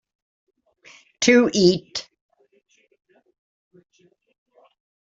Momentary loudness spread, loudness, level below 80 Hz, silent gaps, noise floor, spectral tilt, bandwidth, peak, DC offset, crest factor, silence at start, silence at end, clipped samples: 17 LU; -19 LUFS; -64 dBFS; none; -52 dBFS; -4 dB/octave; 8 kHz; -2 dBFS; under 0.1%; 24 dB; 1.2 s; 3.1 s; under 0.1%